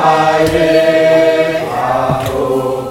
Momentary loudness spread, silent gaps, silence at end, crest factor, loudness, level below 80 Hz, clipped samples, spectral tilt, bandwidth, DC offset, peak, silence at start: 6 LU; none; 0 s; 12 dB; -12 LUFS; -38 dBFS; under 0.1%; -5.5 dB/octave; 16.5 kHz; under 0.1%; 0 dBFS; 0 s